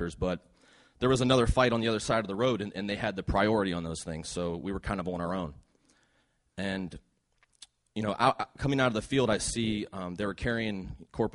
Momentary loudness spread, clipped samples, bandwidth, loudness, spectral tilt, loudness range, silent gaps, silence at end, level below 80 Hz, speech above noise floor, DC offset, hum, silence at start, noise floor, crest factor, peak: 11 LU; under 0.1%; 11.5 kHz; -30 LUFS; -5 dB/octave; 9 LU; none; 0.05 s; -46 dBFS; 42 dB; under 0.1%; none; 0 s; -72 dBFS; 20 dB; -10 dBFS